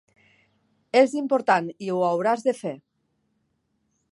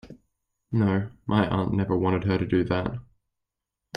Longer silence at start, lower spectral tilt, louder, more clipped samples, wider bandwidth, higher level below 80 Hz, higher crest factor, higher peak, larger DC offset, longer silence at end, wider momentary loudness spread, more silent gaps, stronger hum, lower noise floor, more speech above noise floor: first, 0.95 s vs 0.05 s; second, -5.5 dB/octave vs -8.5 dB/octave; first, -23 LUFS vs -26 LUFS; neither; first, 11.5 kHz vs 5.4 kHz; second, -78 dBFS vs -50 dBFS; about the same, 22 dB vs 20 dB; about the same, -4 dBFS vs -6 dBFS; neither; first, 1.35 s vs 0 s; first, 11 LU vs 5 LU; neither; neither; second, -73 dBFS vs -86 dBFS; second, 50 dB vs 61 dB